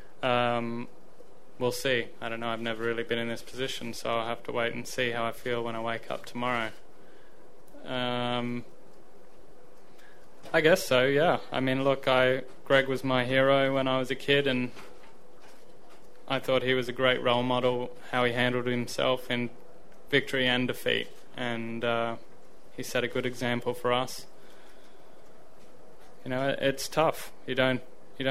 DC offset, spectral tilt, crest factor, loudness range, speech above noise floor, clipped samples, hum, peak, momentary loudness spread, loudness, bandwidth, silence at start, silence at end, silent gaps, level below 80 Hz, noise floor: 1%; -4.5 dB/octave; 22 dB; 8 LU; 27 dB; under 0.1%; none; -8 dBFS; 12 LU; -28 LUFS; 15.5 kHz; 0.2 s; 0 s; none; -62 dBFS; -56 dBFS